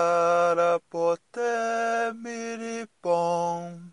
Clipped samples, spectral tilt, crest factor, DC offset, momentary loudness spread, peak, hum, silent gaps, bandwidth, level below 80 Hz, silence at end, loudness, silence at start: under 0.1%; -4.5 dB/octave; 14 dB; under 0.1%; 12 LU; -12 dBFS; none; none; 11 kHz; -82 dBFS; 0 s; -26 LUFS; 0 s